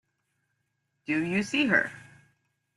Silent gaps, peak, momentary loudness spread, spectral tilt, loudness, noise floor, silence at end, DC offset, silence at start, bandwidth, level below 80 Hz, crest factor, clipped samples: none; -8 dBFS; 12 LU; -4.5 dB/octave; -27 LUFS; -78 dBFS; 0.75 s; under 0.1%; 1.1 s; 12 kHz; -70 dBFS; 22 dB; under 0.1%